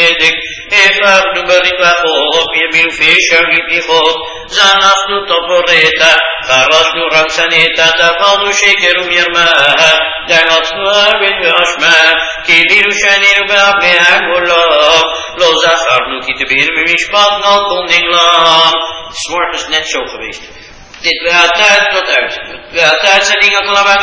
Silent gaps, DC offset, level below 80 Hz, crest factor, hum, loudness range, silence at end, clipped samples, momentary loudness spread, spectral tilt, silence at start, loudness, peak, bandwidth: none; under 0.1%; -42 dBFS; 10 dB; none; 4 LU; 0 s; 0.8%; 8 LU; -0.5 dB/octave; 0 s; -7 LUFS; 0 dBFS; 8 kHz